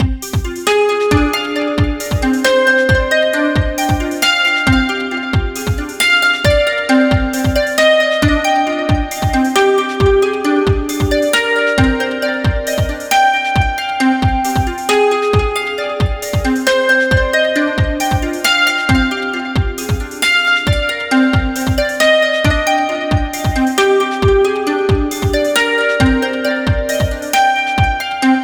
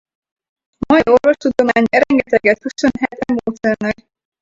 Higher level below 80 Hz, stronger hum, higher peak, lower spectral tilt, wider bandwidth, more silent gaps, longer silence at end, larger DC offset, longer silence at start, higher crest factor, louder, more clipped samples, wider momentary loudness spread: first, -26 dBFS vs -46 dBFS; neither; about the same, 0 dBFS vs 0 dBFS; about the same, -4.5 dB/octave vs -5.5 dB/octave; first, over 20 kHz vs 7.8 kHz; neither; second, 0 s vs 0.5 s; neither; second, 0 s vs 0.9 s; about the same, 14 dB vs 16 dB; about the same, -14 LUFS vs -15 LUFS; neither; second, 6 LU vs 9 LU